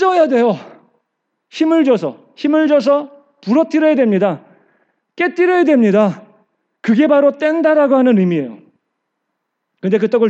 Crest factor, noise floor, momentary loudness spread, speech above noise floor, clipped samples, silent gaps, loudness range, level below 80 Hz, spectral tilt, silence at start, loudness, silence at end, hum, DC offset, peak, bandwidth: 14 dB; -73 dBFS; 13 LU; 61 dB; under 0.1%; none; 2 LU; -86 dBFS; -7.5 dB/octave; 0 s; -14 LUFS; 0 s; none; under 0.1%; 0 dBFS; 8 kHz